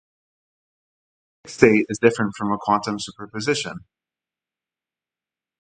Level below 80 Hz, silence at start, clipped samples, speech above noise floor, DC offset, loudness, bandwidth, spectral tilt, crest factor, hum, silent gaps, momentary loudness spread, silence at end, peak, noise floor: -58 dBFS; 1.45 s; under 0.1%; over 69 dB; under 0.1%; -21 LUFS; 9.4 kHz; -5 dB/octave; 24 dB; none; none; 16 LU; 1.8 s; 0 dBFS; under -90 dBFS